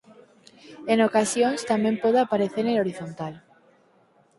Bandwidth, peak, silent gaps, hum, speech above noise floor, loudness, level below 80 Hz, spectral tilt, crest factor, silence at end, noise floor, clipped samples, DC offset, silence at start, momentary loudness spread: 11.5 kHz; -8 dBFS; none; none; 38 dB; -23 LUFS; -68 dBFS; -4.5 dB/octave; 18 dB; 1 s; -61 dBFS; under 0.1%; under 0.1%; 0.65 s; 14 LU